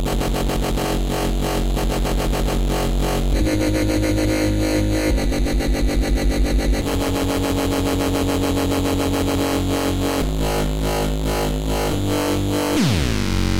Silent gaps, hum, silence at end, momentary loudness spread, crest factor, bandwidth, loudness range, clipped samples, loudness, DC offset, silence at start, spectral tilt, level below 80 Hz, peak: none; none; 0 s; 2 LU; 12 dB; 16 kHz; 1 LU; under 0.1%; -21 LUFS; under 0.1%; 0 s; -5.5 dB/octave; -24 dBFS; -8 dBFS